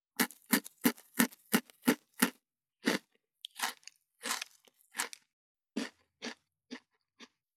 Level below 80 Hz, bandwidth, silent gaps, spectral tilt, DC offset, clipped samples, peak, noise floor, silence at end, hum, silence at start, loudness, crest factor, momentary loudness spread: under -90 dBFS; 18.5 kHz; 5.33-5.55 s; -2.5 dB/octave; under 0.1%; under 0.1%; -8 dBFS; -74 dBFS; 0.3 s; none; 0.2 s; -35 LUFS; 30 dB; 20 LU